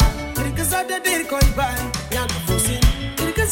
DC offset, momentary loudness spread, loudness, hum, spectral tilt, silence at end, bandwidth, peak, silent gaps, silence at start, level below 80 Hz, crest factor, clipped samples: under 0.1%; 5 LU; -21 LUFS; none; -4 dB/octave; 0 s; 17 kHz; -4 dBFS; none; 0 s; -24 dBFS; 16 dB; under 0.1%